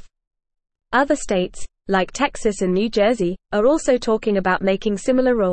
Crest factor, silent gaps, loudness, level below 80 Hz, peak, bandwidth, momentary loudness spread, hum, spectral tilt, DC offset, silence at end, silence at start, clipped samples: 14 dB; 0.27-0.31 s; -20 LUFS; -42 dBFS; -4 dBFS; 8.8 kHz; 5 LU; none; -5 dB/octave; 0.3%; 0 s; 0 s; under 0.1%